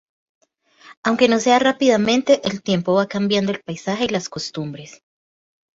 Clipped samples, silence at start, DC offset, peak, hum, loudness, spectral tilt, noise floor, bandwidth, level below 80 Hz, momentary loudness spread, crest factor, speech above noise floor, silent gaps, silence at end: under 0.1%; 0.85 s; under 0.1%; -2 dBFS; none; -19 LUFS; -4.5 dB/octave; -48 dBFS; 8 kHz; -60 dBFS; 12 LU; 18 dB; 30 dB; 0.97-1.03 s; 0.85 s